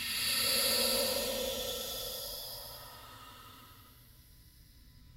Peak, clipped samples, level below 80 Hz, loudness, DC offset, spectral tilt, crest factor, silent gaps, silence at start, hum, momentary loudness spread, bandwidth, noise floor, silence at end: -18 dBFS; under 0.1%; -58 dBFS; -32 LUFS; under 0.1%; -0.5 dB/octave; 18 dB; none; 0 s; none; 23 LU; 16 kHz; -58 dBFS; 0 s